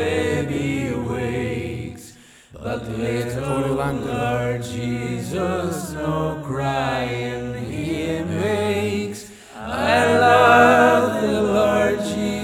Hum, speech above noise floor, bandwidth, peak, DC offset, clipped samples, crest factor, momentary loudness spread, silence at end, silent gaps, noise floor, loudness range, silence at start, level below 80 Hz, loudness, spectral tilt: none; 22 dB; 18 kHz; -2 dBFS; under 0.1%; under 0.1%; 18 dB; 14 LU; 0 s; none; -46 dBFS; 9 LU; 0 s; -44 dBFS; -20 LUFS; -5.5 dB/octave